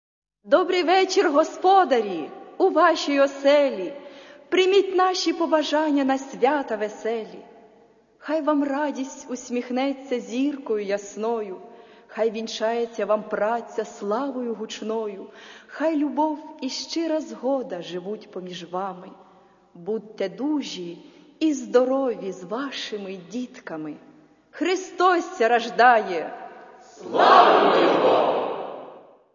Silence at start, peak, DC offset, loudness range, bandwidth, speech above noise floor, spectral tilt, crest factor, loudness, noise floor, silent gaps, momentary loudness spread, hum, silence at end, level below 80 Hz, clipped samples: 0.45 s; 0 dBFS; under 0.1%; 10 LU; 7.4 kHz; 33 dB; -4 dB/octave; 22 dB; -23 LUFS; -56 dBFS; none; 16 LU; none; 0.35 s; -74 dBFS; under 0.1%